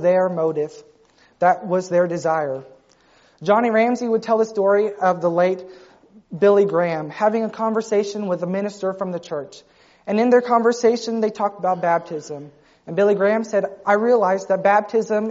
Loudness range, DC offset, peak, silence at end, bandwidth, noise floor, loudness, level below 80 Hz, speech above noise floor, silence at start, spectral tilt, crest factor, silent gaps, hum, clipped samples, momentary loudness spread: 3 LU; under 0.1%; -4 dBFS; 0 s; 8 kHz; -55 dBFS; -20 LUFS; -68 dBFS; 36 dB; 0 s; -5 dB/octave; 16 dB; none; none; under 0.1%; 12 LU